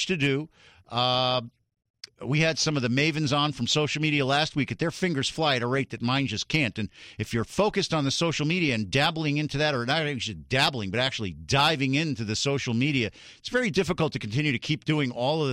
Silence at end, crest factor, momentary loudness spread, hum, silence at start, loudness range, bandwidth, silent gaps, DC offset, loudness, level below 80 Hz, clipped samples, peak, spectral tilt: 0 s; 16 dB; 6 LU; none; 0 s; 2 LU; 14.5 kHz; 1.90-1.94 s; under 0.1%; -26 LUFS; -54 dBFS; under 0.1%; -10 dBFS; -4.5 dB/octave